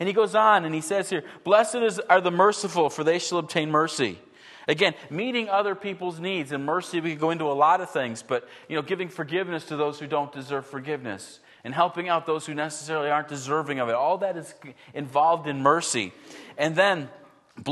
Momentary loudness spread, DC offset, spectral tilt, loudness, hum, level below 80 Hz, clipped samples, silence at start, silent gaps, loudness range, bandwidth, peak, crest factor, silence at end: 12 LU; under 0.1%; -4 dB/octave; -25 LUFS; none; -76 dBFS; under 0.1%; 0 s; none; 6 LU; 12.5 kHz; -4 dBFS; 22 dB; 0 s